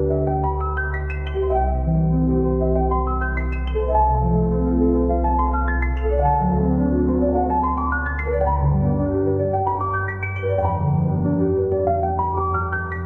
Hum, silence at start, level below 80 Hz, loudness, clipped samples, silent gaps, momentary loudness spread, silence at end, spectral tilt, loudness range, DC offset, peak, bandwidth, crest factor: none; 0 s; -26 dBFS; -21 LUFS; under 0.1%; none; 5 LU; 0 s; -11.5 dB/octave; 2 LU; 0.3%; -6 dBFS; 3.3 kHz; 12 dB